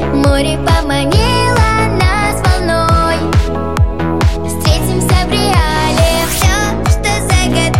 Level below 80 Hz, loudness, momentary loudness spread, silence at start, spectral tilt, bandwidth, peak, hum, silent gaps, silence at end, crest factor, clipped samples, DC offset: -18 dBFS; -12 LUFS; 3 LU; 0 s; -5 dB/octave; 16.5 kHz; -2 dBFS; none; none; 0 s; 10 dB; under 0.1%; 3%